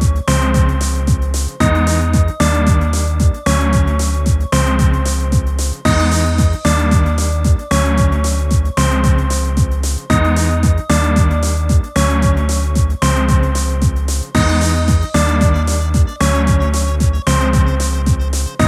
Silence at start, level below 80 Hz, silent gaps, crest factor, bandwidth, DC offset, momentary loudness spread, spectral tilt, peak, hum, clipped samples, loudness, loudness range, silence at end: 0 s; -18 dBFS; none; 12 dB; 14.5 kHz; under 0.1%; 3 LU; -5.5 dB/octave; -2 dBFS; none; under 0.1%; -15 LUFS; 1 LU; 0 s